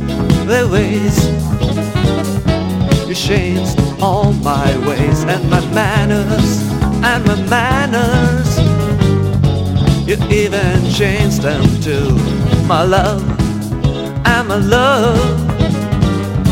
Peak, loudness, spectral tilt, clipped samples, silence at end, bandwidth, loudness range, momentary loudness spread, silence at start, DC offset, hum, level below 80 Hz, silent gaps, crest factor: 0 dBFS; -14 LUFS; -6 dB/octave; under 0.1%; 0 s; 16.5 kHz; 1 LU; 4 LU; 0 s; under 0.1%; none; -24 dBFS; none; 12 dB